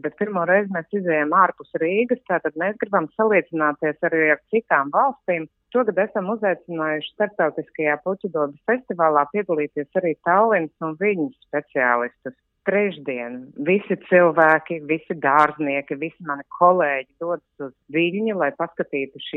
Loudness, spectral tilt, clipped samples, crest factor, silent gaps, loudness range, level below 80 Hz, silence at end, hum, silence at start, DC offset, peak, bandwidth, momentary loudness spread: -21 LUFS; -8 dB/octave; under 0.1%; 20 dB; none; 4 LU; -72 dBFS; 0 s; none; 0.05 s; under 0.1%; -2 dBFS; 4.1 kHz; 11 LU